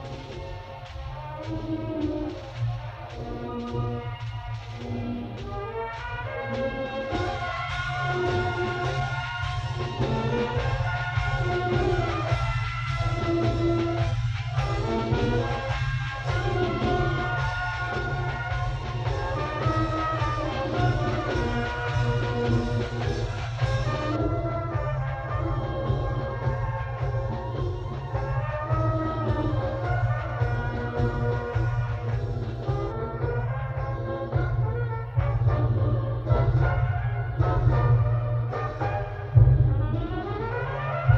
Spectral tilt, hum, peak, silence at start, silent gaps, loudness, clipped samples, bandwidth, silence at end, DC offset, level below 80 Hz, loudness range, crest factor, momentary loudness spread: -7.5 dB/octave; none; -4 dBFS; 0 s; none; -27 LUFS; under 0.1%; 7.6 kHz; 0 s; under 0.1%; -36 dBFS; 8 LU; 22 dB; 8 LU